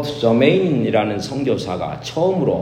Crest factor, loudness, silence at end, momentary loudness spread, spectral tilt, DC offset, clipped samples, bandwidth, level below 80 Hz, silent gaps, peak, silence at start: 16 dB; -18 LUFS; 0 s; 10 LU; -6.5 dB/octave; under 0.1%; under 0.1%; 14.5 kHz; -50 dBFS; none; 0 dBFS; 0 s